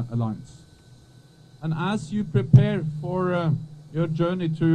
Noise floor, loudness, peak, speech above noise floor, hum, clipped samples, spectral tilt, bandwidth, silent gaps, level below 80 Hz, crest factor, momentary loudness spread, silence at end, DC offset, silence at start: -51 dBFS; -24 LUFS; -2 dBFS; 29 dB; none; under 0.1%; -8.5 dB/octave; 9.2 kHz; none; -52 dBFS; 22 dB; 13 LU; 0 s; under 0.1%; 0 s